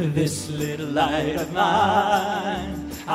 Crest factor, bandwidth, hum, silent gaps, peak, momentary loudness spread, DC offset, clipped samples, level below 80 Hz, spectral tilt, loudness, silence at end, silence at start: 16 dB; 16 kHz; none; none; -8 dBFS; 9 LU; under 0.1%; under 0.1%; -46 dBFS; -5 dB/octave; -23 LUFS; 0 s; 0 s